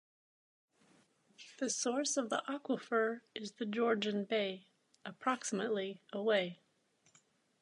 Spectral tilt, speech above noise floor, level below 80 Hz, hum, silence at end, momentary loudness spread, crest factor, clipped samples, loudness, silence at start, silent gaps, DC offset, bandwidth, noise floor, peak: -3 dB/octave; 38 dB; under -90 dBFS; none; 1.1 s; 13 LU; 20 dB; under 0.1%; -37 LUFS; 1.4 s; none; under 0.1%; 11 kHz; -74 dBFS; -18 dBFS